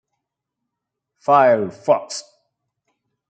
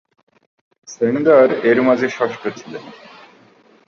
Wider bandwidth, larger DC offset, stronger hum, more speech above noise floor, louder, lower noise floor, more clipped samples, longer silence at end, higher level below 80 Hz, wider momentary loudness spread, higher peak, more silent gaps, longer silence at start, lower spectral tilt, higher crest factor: first, 9.2 kHz vs 7.2 kHz; neither; first, 60 Hz at -60 dBFS vs none; first, 65 dB vs 35 dB; about the same, -17 LUFS vs -16 LUFS; first, -82 dBFS vs -51 dBFS; neither; first, 1.1 s vs 0.9 s; second, -74 dBFS vs -66 dBFS; second, 17 LU vs 22 LU; about the same, -2 dBFS vs -2 dBFS; neither; first, 1.3 s vs 0.9 s; second, -4.5 dB/octave vs -6 dB/octave; about the same, 20 dB vs 16 dB